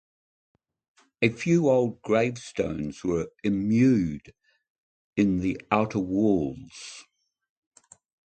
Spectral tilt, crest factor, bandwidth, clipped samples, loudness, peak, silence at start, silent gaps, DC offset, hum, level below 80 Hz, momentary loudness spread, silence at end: -7 dB/octave; 22 dB; 9 kHz; under 0.1%; -25 LUFS; -6 dBFS; 1.2 s; 4.70-5.13 s; under 0.1%; none; -54 dBFS; 16 LU; 1.35 s